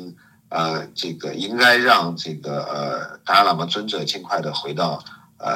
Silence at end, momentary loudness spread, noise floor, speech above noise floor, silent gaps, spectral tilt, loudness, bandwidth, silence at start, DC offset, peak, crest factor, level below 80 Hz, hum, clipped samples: 0 s; 14 LU; -41 dBFS; 21 dB; none; -4 dB/octave; -20 LUFS; 16.5 kHz; 0 s; under 0.1%; 0 dBFS; 22 dB; -74 dBFS; none; under 0.1%